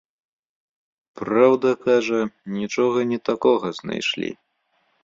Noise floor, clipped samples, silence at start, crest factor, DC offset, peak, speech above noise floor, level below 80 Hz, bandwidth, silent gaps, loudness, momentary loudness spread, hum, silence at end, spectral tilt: -68 dBFS; under 0.1%; 1.15 s; 20 dB; under 0.1%; -4 dBFS; 48 dB; -64 dBFS; 7.8 kHz; none; -21 LUFS; 11 LU; none; 0.7 s; -5 dB/octave